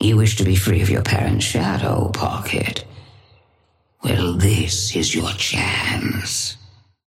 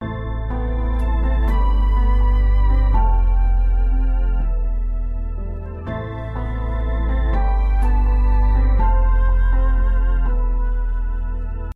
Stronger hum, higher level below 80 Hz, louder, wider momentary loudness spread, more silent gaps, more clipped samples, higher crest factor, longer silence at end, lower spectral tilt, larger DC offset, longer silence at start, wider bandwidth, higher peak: neither; second, -40 dBFS vs -16 dBFS; about the same, -19 LUFS vs -21 LUFS; second, 6 LU vs 9 LU; neither; neither; first, 16 dB vs 10 dB; first, 0.5 s vs 0.05 s; second, -4.5 dB/octave vs -9.5 dB/octave; neither; about the same, 0 s vs 0 s; first, 16 kHz vs 3.8 kHz; about the same, -4 dBFS vs -6 dBFS